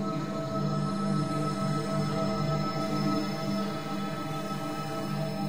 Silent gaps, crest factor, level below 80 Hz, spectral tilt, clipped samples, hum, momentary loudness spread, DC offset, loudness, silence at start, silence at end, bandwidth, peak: none; 12 dB; -58 dBFS; -6.5 dB/octave; under 0.1%; none; 5 LU; 0.7%; -31 LUFS; 0 s; 0 s; 16 kHz; -16 dBFS